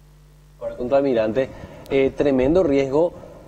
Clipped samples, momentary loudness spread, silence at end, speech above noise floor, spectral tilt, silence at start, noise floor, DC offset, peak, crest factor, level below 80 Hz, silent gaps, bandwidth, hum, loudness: under 0.1%; 13 LU; 0.05 s; 30 dB; -7.5 dB/octave; 0.6 s; -49 dBFS; under 0.1%; -6 dBFS; 14 dB; -42 dBFS; none; 9 kHz; none; -20 LUFS